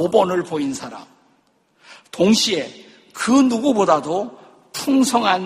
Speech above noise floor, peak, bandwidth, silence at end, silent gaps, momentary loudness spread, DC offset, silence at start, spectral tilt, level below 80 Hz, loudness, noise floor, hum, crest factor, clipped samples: 43 dB; 0 dBFS; 15 kHz; 0 s; none; 18 LU; under 0.1%; 0 s; -4 dB/octave; -60 dBFS; -18 LUFS; -61 dBFS; none; 20 dB; under 0.1%